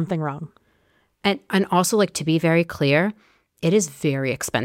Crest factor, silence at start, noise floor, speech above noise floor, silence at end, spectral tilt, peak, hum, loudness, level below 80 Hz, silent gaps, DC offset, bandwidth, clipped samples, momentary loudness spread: 16 dB; 0 s; -64 dBFS; 43 dB; 0 s; -5 dB/octave; -6 dBFS; none; -21 LUFS; -58 dBFS; none; under 0.1%; 16.5 kHz; under 0.1%; 8 LU